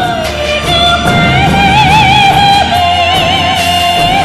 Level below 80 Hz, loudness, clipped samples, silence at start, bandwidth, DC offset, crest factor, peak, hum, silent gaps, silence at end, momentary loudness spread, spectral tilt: -24 dBFS; -7 LUFS; 0.1%; 0 s; 16 kHz; under 0.1%; 8 dB; 0 dBFS; none; none; 0 s; 5 LU; -4 dB/octave